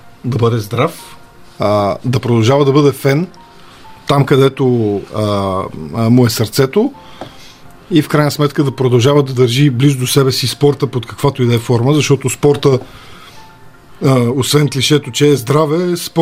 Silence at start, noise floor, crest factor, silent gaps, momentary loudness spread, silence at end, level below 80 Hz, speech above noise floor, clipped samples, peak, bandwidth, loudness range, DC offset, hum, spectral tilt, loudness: 0.05 s; -38 dBFS; 14 dB; none; 8 LU; 0 s; -48 dBFS; 25 dB; under 0.1%; 0 dBFS; 16 kHz; 2 LU; under 0.1%; none; -6 dB/octave; -13 LUFS